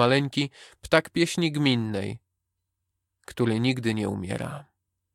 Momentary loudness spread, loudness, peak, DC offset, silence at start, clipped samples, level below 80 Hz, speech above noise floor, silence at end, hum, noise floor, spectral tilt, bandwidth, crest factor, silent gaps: 15 LU; -26 LUFS; -6 dBFS; under 0.1%; 0 s; under 0.1%; -58 dBFS; 56 dB; 0.55 s; none; -81 dBFS; -5.5 dB/octave; 15.5 kHz; 22 dB; none